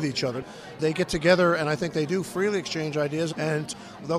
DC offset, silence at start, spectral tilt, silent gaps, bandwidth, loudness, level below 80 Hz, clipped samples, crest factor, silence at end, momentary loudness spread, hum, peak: under 0.1%; 0 s; -5 dB/octave; none; 15 kHz; -25 LUFS; -54 dBFS; under 0.1%; 22 dB; 0 s; 12 LU; none; -4 dBFS